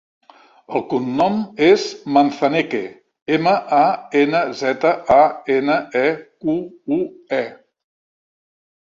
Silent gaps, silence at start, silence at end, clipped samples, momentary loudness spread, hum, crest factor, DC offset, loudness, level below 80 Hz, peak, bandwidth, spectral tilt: 3.22-3.26 s; 0.7 s; 1.25 s; under 0.1%; 10 LU; none; 16 dB; under 0.1%; -18 LUFS; -58 dBFS; -2 dBFS; 7.6 kHz; -5.5 dB/octave